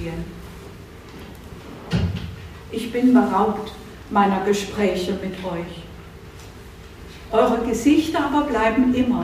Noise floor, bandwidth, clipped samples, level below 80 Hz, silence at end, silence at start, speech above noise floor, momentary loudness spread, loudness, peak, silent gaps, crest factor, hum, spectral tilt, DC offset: -40 dBFS; 15.5 kHz; under 0.1%; -42 dBFS; 0 s; 0 s; 20 dB; 22 LU; -21 LUFS; -4 dBFS; none; 18 dB; none; -6 dB/octave; under 0.1%